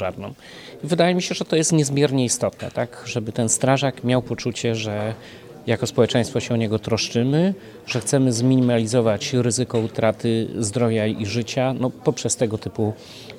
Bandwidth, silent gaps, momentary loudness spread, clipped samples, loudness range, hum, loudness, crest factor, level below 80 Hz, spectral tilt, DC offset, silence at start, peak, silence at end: 15 kHz; none; 9 LU; under 0.1%; 3 LU; none; -21 LUFS; 18 dB; -56 dBFS; -5 dB/octave; under 0.1%; 0 s; -2 dBFS; 0 s